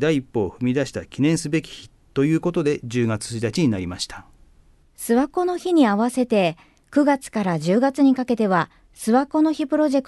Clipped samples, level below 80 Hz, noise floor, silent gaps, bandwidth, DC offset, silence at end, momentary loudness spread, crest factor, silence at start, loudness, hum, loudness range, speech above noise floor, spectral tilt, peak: under 0.1%; -52 dBFS; -54 dBFS; none; 12.5 kHz; under 0.1%; 0.05 s; 11 LU; 16 dB; 0 s; -21 LUFS; none; 4 LU; 34 dB; -6 dB/octave; -6 dBFS